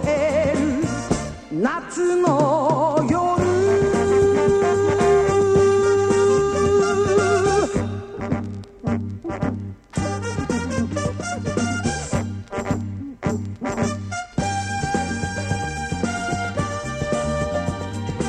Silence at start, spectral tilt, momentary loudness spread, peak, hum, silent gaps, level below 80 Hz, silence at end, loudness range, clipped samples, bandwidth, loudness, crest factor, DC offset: 0 s; -6 dB/octave; 10 LU; -4 dBFS; none; none; -40 dBFS; 0 s; 8 LU; under 0.1%; 10.5 kHz; -21 LUFS; 16 dB; under 0.1%